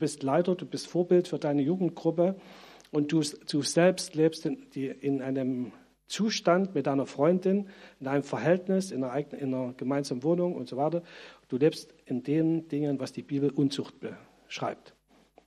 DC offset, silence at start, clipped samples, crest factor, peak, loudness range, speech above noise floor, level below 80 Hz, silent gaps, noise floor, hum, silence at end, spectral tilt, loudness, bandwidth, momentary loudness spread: under 0.1%; 0 s; under 0.1%; 18 dB; -10 dBFS; 3 LU; 33 dB; -74 dBFS; none; -62 dBFS; none; 0.55 s; -6 dB/octave; -29 LUFS; 13.5 kHz; 11 LU